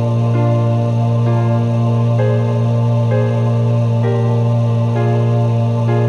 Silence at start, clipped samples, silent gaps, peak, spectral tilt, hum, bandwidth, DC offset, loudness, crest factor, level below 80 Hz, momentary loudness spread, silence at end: 0 s; under 0.1%; none; -4 dBFS; -9 dB/octave; none; 6.6 kHz; under 0.1%; -15 LUFS; 10 dB; -54 dBFS; 1 LU; 0 s